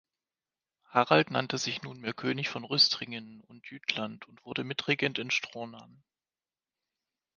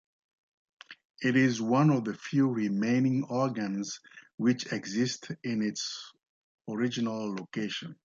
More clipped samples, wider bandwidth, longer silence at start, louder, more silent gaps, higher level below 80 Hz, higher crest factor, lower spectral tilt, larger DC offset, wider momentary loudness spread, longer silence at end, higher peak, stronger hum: neither; first, 10 kHz vs 7.6 kHz; about the same, 0.9 s vs 0.9 s; about the same, -29 LUFS vs -30 LUFS; second, none vs 1.05-1.14 s, 4.34-4.38 s, 6.29-6.58 s; about the same, -76 dBFS vs -74 dBFS; first, 26 dB vs 16 dB; second, -3.5 dB/octave vs -5.5 dB/octave; neither; first, 18 LU vs 14 LU; first, 1.55 s vs 0.1 s; first, -6 dBFS vs -14 dBFS; neither